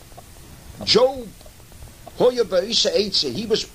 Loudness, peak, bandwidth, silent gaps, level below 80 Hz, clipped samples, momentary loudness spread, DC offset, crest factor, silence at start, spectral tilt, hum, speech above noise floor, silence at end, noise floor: -19 LUFS; -4 dBFS; 15.5 kHz; none; -46 dBFS; under 0.1%; 16 LU; 0.1%; 18 dB; 0.1 s; -3 dB/octave; none; 23 dB; 0 s; -43 dBFS